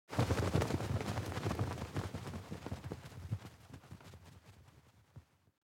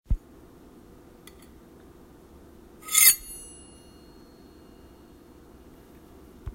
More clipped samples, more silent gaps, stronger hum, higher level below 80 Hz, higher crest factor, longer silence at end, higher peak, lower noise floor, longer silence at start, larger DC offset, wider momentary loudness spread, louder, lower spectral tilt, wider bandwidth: neither; neither; neither; second, -54 dBFS vs -42 dBFS; second, 22 dB vs 28 dB; first, 0.45 s vs 0.05 s; second, -18 dBFS vs -2 dBFS; first, -64 dBFS vs -51 dBFS; about the same, 0.1 s vs 0.1 s; neither; second, 25 LU vs 29 LU; second, -40 LUFS vs -19 LUFS; first, -6 dB/octave vs 0 dB/octave; about the same, 16.5 kHz vs 16 kHz